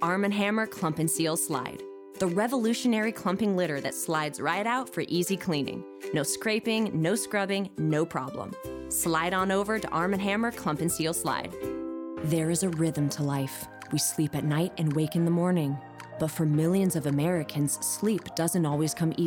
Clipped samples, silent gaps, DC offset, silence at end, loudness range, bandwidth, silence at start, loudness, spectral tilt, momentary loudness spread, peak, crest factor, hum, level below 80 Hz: under 0.1%; none; under 0.1%; 0 s; 2 LU; over 20 kHz; 0 s; -28 LUFS; -5 dB/octave; 8 LU; -12 dBFS; 16 dB; none; -62 dBFS